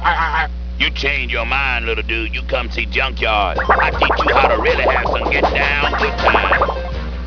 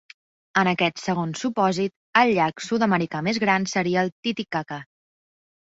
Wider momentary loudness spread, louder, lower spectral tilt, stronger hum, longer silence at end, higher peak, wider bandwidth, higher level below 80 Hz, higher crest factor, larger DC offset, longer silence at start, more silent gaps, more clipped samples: about the same, 7 LU vs 8 LU; first, -16 LUFS vs -23 LUFS; about the same, -5.5 dB/octave vs -5 dB/octave; neither; second, 0 s vs 0.85 s; first, 0 dBFS vs -4 dBFS; second, 5.4 kHz vs 8 kHz; first, -24 dBFS vs -64 dBFS; about the same, 16 dB vs 20 dB; first, 0.4% vs under 0.1%; second, 0 s vs 0.55 s; second, none vs 1.96-2.13 s, 4.12-4.23 s; neither